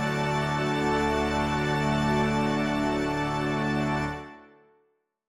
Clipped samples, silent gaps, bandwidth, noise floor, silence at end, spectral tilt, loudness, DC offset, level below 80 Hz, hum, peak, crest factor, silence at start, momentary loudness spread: under 0.1%; none; 13 kHz; -71 dBFS; 0.85 s; -6 dB/octave; -26 LUFS; under 0.1%; -44 dBFS; none; -12 dBFS; 14 dB; 0 s; 3 LU